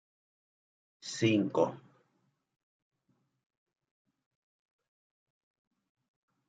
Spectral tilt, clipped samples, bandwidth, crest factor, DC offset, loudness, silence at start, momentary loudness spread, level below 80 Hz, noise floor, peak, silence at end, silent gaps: -5.5 dB/octave; under 0.1%; 9 kHz; 26 dB; under 0.1%; -31 LUFS; 1.05 s; 14 LU; -82 dBFS; -78 dBFS; -14 dBFS; 4.7 s; none